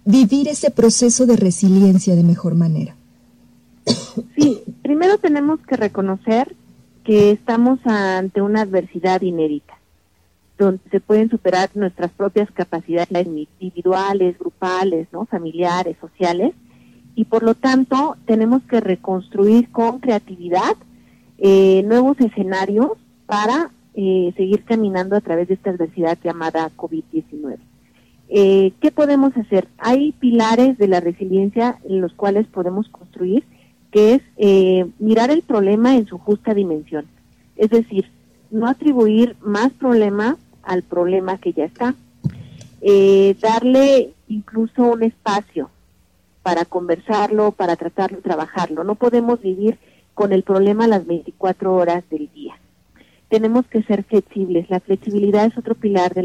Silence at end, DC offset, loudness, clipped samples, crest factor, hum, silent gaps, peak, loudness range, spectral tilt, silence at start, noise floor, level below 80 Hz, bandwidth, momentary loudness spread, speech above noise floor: 0 s; under 0.1%; -17 LUFS; under 0.1%; 16 dB; none; none; -2 dBFS; 5 LU; -6 dB/octave; 0.05 s; -59 dBFS; -56 dBFS; 11.5 kHz; 12 LU; 43 dB